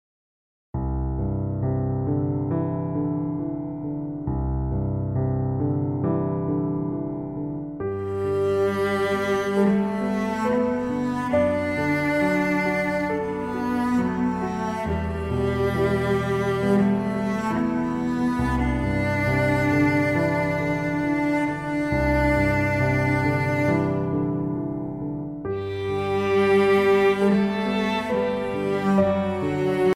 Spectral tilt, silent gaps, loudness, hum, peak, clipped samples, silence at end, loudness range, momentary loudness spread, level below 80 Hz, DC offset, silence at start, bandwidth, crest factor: -7.5 dB/octave; none; -24 LUFS; none; -10 dBFS; under 0.1%; 0 s; 5 LU; 8 LU; -40 dBFS; under 0.1%; 0.75 s; 15.5 kHz; 14 dB